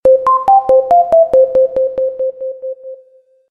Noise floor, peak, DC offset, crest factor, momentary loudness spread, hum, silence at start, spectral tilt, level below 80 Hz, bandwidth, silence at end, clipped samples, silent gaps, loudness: -48 dBFS; -2 dBFS; under 0.1%; 10 dB; 15 LU; none; 0.05 s; -6.5 dB/octave; -48 dBFS; 3.5 kHz; 0.55 s; under 0.1%; none; -11 LUFS